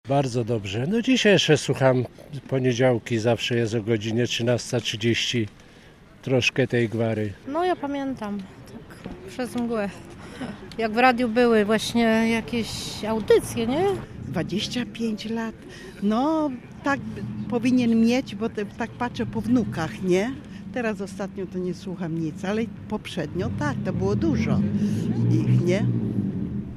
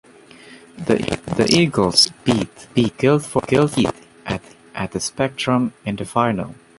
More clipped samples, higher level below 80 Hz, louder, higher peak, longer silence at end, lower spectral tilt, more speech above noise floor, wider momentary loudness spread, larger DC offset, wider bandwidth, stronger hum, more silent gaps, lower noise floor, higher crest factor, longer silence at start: neither; about the same, -50 dBFS vs -46 dBFS; second, -24 LUFS vs -19 LUFS; about the same, -4 dBFS vs -2 dBFS; second, 0 s vs 0.25 s; about the same, -5.5 dB/octave vs -4.5 dB/octave; about the same, 25 dB vs 25 dB; about the same, 13 LU vs 13 LU; neither; first, 14.5 kHz vs 11.5 kHz; neither; neither; first, -49 dBFS vs -44 dBFS; about the same, 20 dB vs 18 dB; second, 0.05 s vs 0.5 s